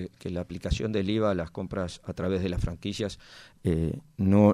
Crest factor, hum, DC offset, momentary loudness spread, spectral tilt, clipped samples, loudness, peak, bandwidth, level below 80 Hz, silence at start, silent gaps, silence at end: 20 dB; none; under 0.1%; 9 LU; -7.5 dB/octave; under 0.1%; -30 LUFS; -8 dBFS; 11.5 kHz; -42 dBFS; 0 s; none; 0 s